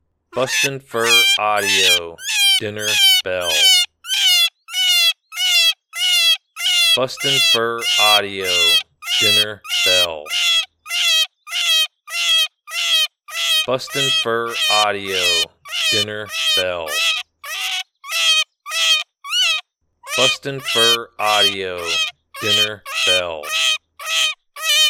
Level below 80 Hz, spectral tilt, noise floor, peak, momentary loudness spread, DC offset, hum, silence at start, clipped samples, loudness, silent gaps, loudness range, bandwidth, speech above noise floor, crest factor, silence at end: -62 dBFS; 0 dB/octave; -43 dBFS; 0 dBFS; 9 LU; under 0.1%; none; 0.35 s; under 0.1%; -15 LUFS; none; 4 LU; 19 kHz; 25 dB; 18 dB; 0 s